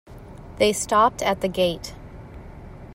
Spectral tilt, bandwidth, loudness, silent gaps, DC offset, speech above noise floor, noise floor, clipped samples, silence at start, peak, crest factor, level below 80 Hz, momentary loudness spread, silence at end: -3.5 dB/octave; 16 kHz; -21 LUFS; none; under 0.1%; 19 dB; -41 dBFS; under 0.1%; 0.1 s; -6 dBFS; 20 dB; -44 dBFS; 23 LU; 0 s